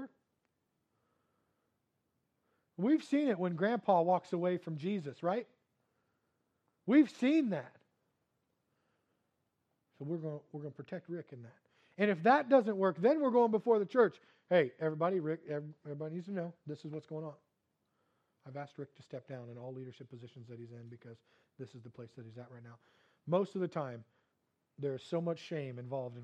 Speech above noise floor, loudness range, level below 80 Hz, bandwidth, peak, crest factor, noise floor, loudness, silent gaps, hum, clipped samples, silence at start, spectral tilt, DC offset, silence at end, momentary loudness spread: 48 dB; 19 LU; under -90 dBFS; 9 kHz; -14 dBFS; 22 dB; -83 dBFS; -34 LUFS; none; none; under 0.1%; 0 s; -8 dB/octave; under 0.1%; 0 s; 23 LU